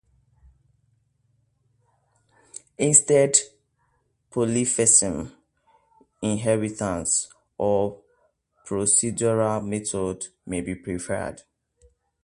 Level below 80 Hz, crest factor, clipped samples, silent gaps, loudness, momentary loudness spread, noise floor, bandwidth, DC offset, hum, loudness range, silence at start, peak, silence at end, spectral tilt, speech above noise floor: -54 dBFS; 24 dB; under 0.1%; none; -22 LUFS; 18 LU; -69 dBFS; 11.5 kHz; under 0.1%; none; 6 LU; 2.55 s; -2 dBFS; 0.85 s; -4 dB/octave; 46 dB